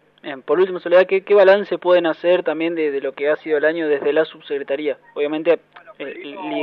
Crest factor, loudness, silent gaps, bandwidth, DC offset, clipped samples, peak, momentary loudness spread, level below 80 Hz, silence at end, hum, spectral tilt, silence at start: 18 dB; -18 LUFS; none; 5.4 kHz; under 0.1%; under 0.1%; 0 dBFS; 16 LU; -78 dBFS; 0 s; none; -7 dB/octave; 0.25 s